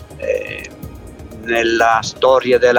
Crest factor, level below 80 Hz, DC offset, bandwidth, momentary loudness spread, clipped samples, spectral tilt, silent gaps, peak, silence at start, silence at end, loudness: 16 dB; -42 dBFS; under 0.1%; 17.5 kHz; 22 LU; under 0.1%; -4 dB/octave; none; 0 dBFS; 0 s; 0 s; -15 LUFS